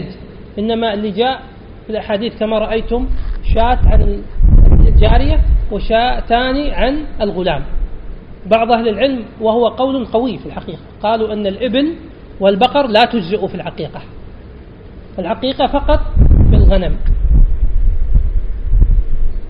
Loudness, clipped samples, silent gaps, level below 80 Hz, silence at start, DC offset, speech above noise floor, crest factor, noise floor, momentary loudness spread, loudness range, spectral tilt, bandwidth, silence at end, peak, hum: -15 LUFS; under 0.1%; none; -14 dBFS; 0 s; under 0.1%; 20 dB; 12 dB; -34 dBFS; 16 LU; 4 LU; -9 dB/octave; 5.2 kHz; 0 s; 0 dBFS; none